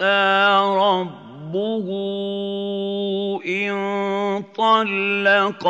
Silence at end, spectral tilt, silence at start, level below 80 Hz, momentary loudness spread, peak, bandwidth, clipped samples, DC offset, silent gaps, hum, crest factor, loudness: 0 s; -5.5 dB/octave; 0 s; -78 dBFS; 10 LU; -4 dBFS; 8 kHz; under 0.1%; under 0.1%; none; none; 16 dB; -20 LUFS